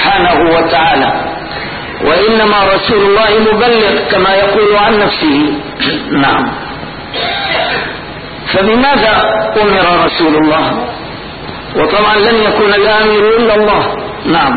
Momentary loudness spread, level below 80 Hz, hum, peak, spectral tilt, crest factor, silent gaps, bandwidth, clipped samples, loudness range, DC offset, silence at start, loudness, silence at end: 12 LU; -34 dBFS; none; 0 dBFS; -11 dB/octave; 10 dB; none; 4.8 kHz; under 0.1%; 4 LU; under 0.1%; 0 s; -9 LUFS; 0 s